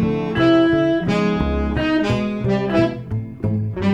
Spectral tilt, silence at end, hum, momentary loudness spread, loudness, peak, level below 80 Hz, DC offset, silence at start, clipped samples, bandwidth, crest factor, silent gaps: -7.5 dB/octave; 0 s; none; 8 LU; -19 LUFS; -4 dBFS; -32 dBFS; under 0.1%; 0 s; under 0.1%; 8.2 kHz; 14 dB; none